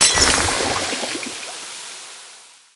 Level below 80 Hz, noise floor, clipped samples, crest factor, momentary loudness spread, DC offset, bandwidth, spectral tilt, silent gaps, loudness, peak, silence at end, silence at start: -40 dBFS; -45 dBFS; under 0.1%; 22 dB; 21 LU; under 0.1%; 11.5 kHz; -1 dB/octave; none; -19 LUFS; 0 dBFS; 0.3 s; 0 s